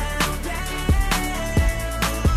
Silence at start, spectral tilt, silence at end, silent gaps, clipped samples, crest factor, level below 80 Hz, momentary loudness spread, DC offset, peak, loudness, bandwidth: 0 s; -4.5 dB/octave; 0 s; none; under 0.1%; 14 dB; -24 dBFS; 4 LU; under 0.1%; -6 dBFS; -23 LUFS; 16 kHz